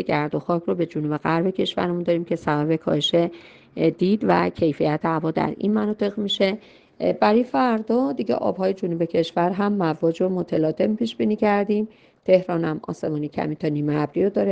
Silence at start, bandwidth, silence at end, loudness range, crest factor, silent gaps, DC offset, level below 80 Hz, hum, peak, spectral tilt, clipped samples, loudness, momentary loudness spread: 0 s; 8.2 kHz; 0 s; 1 LU; 18 dB; none; under 0.1%; -60 dBFS; none; -4 dBFS; -7 dB/octave; under 0.1%; -22 LUFS; 6 LU